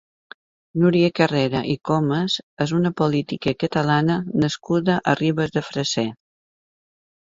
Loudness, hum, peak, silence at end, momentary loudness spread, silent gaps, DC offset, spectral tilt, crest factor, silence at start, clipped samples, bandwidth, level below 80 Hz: -21 LUFS; none; -2 dBFS; 1.25 s; 6 LU; 2.43-2.57 s; under 0.1%; -6 dB/octave; 20 dB; 0.75 s; under 0.1%; 7.8 kHz; -56 dBFS